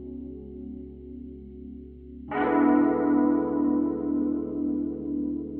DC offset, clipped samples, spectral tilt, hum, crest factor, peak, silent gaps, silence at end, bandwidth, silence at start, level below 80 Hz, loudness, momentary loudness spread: under 0.1%; under 0.1%; -7.5 dB/octave; none; 16 dB; -10 dBFS; none; 0 s; 3.4 kHz; 0 s; -50 dBFS; -25 LUFS; 20 LU